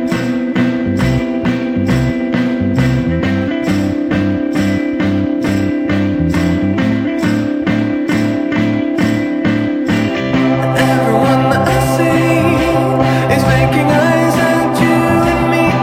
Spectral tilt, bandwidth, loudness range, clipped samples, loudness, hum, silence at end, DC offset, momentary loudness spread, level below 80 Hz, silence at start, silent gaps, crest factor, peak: -6.5 dB/octave; 16 kHz; 3 LU; under 0.1%; -14 LUFS; none; 0 s; under 0.1%; 4 LU; -32 dBFS; 0 s; none; 12 dB; 0 dBFS